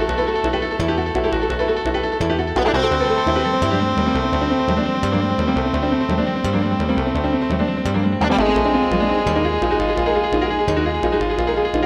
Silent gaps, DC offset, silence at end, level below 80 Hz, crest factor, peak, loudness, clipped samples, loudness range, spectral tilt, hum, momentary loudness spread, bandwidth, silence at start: none; 0.1%; 0 s; -30 dBFS; 14 dB; -6 dBFS; -19 LUFS; under 0.1%; 1 LU; -6.5 dB/octave; none; 3 LU; 11 kHz; 0 s